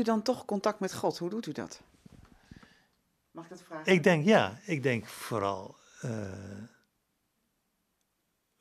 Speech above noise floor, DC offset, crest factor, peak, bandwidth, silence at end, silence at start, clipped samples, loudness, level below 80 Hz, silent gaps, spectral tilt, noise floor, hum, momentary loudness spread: 48 dB; under 0.1%; 24 dB; -10 dBFS; 14.5 kHz; 1.95 s; 0 s; under 0.1%; -30 LUFS; -72 dBFS; none; -5.5 dB/octave; -79 dBFS; none; 23 LU